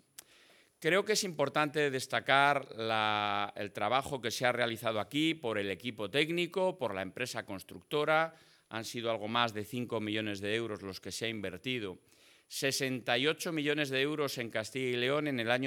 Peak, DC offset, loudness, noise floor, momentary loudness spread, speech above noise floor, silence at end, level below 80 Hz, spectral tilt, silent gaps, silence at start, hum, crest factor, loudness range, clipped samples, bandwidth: -10 dBFS; under 0.1%; -33 LUFS; -63 dBFS; 9 LU; 30 dB; 0 s; -78 dBFS; -4 dB/octave; none; 0.8 s; none; 24 dB; 5 LU; under 0.1%; 19 kHz